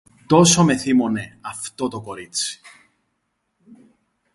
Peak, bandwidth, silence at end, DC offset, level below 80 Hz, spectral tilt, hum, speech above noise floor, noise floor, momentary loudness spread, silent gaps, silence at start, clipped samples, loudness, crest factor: 0 dBFS; 11.5 kHz; 1.8 s; under 0.1%; -56 dBFS; -4 dB/octave; none; 54 dB; -73 dBFS; 18 LU; none; 0.3 s; under 0.1%; -19 LUFS; 22 dB